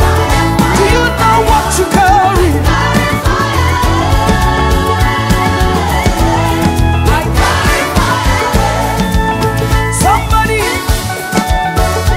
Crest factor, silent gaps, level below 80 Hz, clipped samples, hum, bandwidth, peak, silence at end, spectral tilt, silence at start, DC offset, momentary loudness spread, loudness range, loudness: 10 dB; none; -16 dBFS; under 0.1%; none; 16.5 kHz; 0 dBFS; 0 s; -5 dB/octave; 0 s; under 0.1%; 4 LU; 2 LU; -11 LUFS